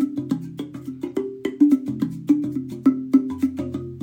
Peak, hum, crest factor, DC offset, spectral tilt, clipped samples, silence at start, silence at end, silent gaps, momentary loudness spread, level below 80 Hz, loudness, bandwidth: -6 dBFS; none; 18 dB; under 0.1%; -8 dB/octave; under 0.1%; 0 s; 0 s; none; 13 LU; -58 dBFS; -23 LUFS; 15.5 kHz